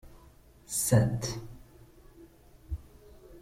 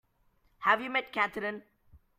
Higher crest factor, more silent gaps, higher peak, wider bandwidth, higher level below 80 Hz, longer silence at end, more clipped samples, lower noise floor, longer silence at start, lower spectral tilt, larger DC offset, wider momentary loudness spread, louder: about the same, 22 dB vs 24 dB; neither; about the same, -12 dBFS vs -10 dBFS; about the same, 16.5 kHz vs 15.5 kHz; first, -50 dBFS vs -68 dBFS; second, 0 s vs 0.2 s; neither; second, -57 dBFS vs -70 dBFS; second, 0.05 s vs 0.6 s; about the same, -5 dB/octave vs -4.5 dB/octave; neither; first, 18 LU vs 10 LU; about the same, -30 LUFS vs -30 LUFS